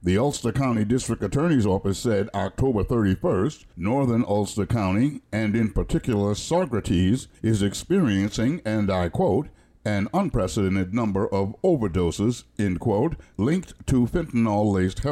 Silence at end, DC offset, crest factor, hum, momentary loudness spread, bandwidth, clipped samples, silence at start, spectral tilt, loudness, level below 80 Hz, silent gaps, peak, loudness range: 0 s; under 0.1%; 12 dB; none; 4 LU; 13.5 kHz; under 0.1%; 0 s; -6.5 dB/octave; -24 LUFS; -40 dBFS; none; -12 dBFS; 1 LU